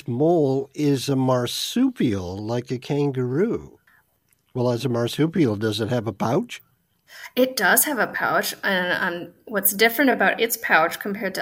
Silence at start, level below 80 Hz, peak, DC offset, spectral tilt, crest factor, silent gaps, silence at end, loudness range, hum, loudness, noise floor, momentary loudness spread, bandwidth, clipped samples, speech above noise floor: 0.05 s; -62 dBFS; -2 dBFS; under 0.1%; -4.5 dB/octave; 20 dB; none; 0 s; 5 LU; none; -22 LUFS; -66 dBFS; 10 LU; 16 kHz; under 0.1%; 44 dB